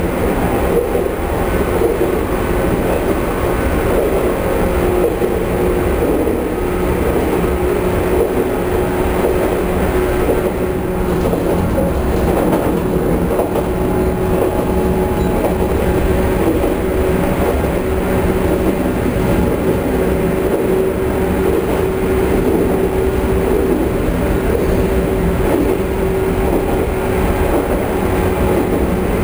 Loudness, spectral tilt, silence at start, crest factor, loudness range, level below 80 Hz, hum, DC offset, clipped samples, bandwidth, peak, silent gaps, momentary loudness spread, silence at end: -16 LUFS; -7 dB/octave; 0 s; 14 dB; 1 LU; -22 dBFS; none; under 0.1%; under 0.1%; over 20 kHz; -2 dBFS; none; 2 LU; 0 s